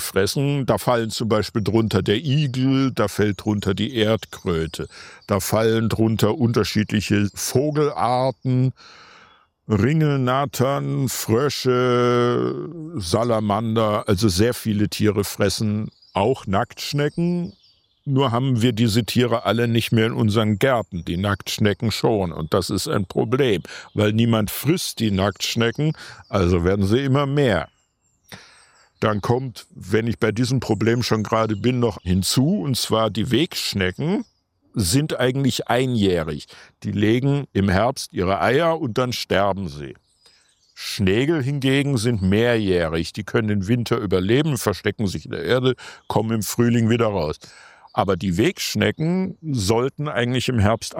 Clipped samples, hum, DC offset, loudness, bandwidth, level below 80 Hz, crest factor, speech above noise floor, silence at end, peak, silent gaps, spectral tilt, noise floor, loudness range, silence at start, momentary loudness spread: under 0.1%; none; under 0.1%; -21 LUFS; 16 kHz; -52 dBFS; 18 dB; 45 dB; 0 s; -2 dBFS; none; -5.5 dB/octave; -66 dBFS; 2 LU; 0 s; 6 LU